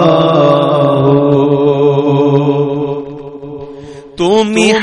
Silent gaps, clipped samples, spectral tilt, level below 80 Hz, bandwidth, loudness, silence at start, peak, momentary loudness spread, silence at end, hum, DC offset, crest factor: none; under 0.1%; -6.5 dB/octave; -46 dBFS; 10.5 kHz; -10 LUFS; 0 s; 0 dBFS; 18 LU; 0 s; none; under 0.1%; 10 dB